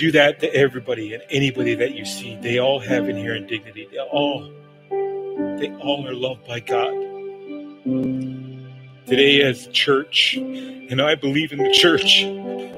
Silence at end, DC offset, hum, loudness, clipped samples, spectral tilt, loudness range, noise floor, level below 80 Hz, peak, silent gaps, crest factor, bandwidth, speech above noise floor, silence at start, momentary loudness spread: 0 s; under 0.1%; none; -19 LUFS; under 0.1%; -4 dB/octave; 9 LU; -40 dBFS; -62 dBFS; 0 dBFS; none; 20 dB; 16 kHz; 20 dB; 0 s; 17 LU